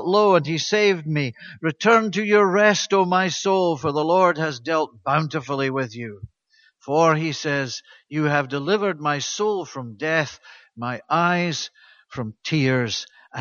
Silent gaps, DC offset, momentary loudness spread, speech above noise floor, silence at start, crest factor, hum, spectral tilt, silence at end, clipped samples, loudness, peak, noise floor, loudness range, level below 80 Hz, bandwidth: none; under 0.1%; 13 LU; 39 dB; 0 s; 20 dB; none; -5 dB/octave; 0 s; under 0.1%; -21 LUFS; -2 dBFS; -60 dBFS; 6 LU; -64 dBFS; 7.4 kHz